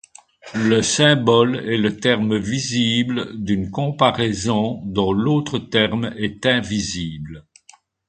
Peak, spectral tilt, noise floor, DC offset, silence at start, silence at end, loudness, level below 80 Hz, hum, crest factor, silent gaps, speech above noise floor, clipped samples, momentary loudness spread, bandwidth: 0 dBFS; -4.5 dB/octave; -52 dBFS; under 0.1%; 0.45 s; 0.7 s; -19 LUFS; -46 dBFS; none; 20 dB; none; 33 dB; under 0.1%; 10 LU; 9.4 kHz